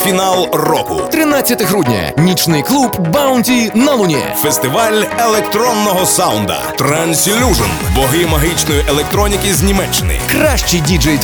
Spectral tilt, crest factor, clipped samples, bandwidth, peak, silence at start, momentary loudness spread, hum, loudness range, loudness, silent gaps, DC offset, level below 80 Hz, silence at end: -4 dB/octave; 12 dB; under 0.1%; over 20 kHz; 0 dBFS; 0 s; 3 LU; none; 1 LU; -12 LUFS; none; under 0.1%; -24 dBFS; 0 s